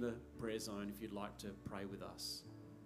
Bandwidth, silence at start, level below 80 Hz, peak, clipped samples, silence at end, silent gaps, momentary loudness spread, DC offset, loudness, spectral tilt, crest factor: 15.5 kHz; 0 s; -66 dBFS; -30 dBFS; under 0.1%; 0 s; none; 5 LU; under 0.1%; -47 LUFS; -4.5 dB/octave; 18 dB